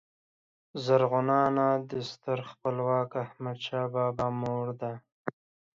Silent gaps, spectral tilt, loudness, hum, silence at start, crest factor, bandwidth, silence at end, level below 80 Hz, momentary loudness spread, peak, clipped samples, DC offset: 5.12-5.25 s; -7.5 dB/octave; -30 LUFS; none; 0.75 s; 18 dB; 7.6 kHz; 0.45 s; -66 dBFS; 14 LU; -12 dBFS; under 0.1%; under 0.1%